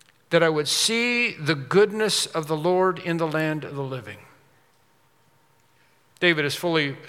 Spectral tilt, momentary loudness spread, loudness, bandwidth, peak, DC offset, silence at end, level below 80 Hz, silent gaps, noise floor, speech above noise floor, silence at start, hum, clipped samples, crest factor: -3.5 dB/octave; 10 LU; -22 LUFS; 16.5 kHz; -4 dBFS; under 0.1%; 0 s; -76 dBFS; none; -62 dBFS; 40 dB; 0.3 s; none; under 0.1%; 22 dB